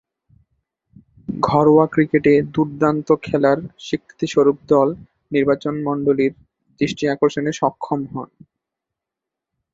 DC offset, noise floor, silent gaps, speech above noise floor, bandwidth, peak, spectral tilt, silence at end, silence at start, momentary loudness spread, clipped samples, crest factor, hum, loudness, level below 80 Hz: under 0.1%; -85 dBFS; none; 67 dB; 7.8 kHz; 0 dBFS; -7 dB/octave; 1.5 s; 1.3 s; 12 LU; under 0.1%; 18 dB; none; -18 LUFS; -54 dBFS